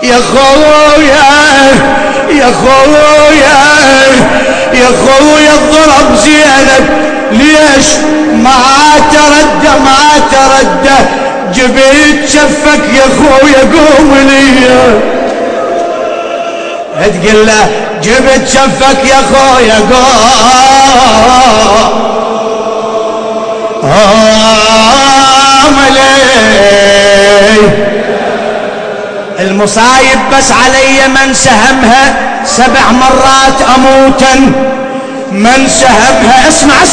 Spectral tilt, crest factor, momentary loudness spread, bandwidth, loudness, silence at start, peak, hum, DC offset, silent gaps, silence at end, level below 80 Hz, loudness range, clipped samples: -3 dB/octave; 4 dB; 9 LU; 11 kHz; -4 LUFS; 0 s; 0 dBFS; none; under 0.1%; none; 0 s; -26 dBFS; 4 LU; 20%